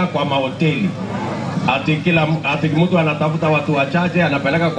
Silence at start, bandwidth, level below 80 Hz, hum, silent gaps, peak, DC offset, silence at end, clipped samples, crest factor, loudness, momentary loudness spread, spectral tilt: 0 s; 9.4 kHz; -48 dBFS; none; none; -2 dBFS; under 0.1%; 0 s; under 0.1%; 14 dB; -17 LUFS; 6 LU; -7 dB/octave